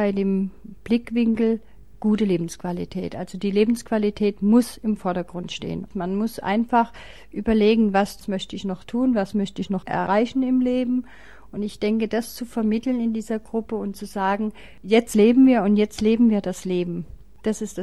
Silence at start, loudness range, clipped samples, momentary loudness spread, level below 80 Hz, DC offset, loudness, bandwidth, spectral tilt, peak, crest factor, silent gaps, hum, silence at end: 0 s; 5 LU; under 0.1%; 12 LU; -50 dBFS; 0.6%; -23 LUFS; 13 kHz; -6.5 dB/octave; -4 dBFS; 18 dB; none; none; 0 s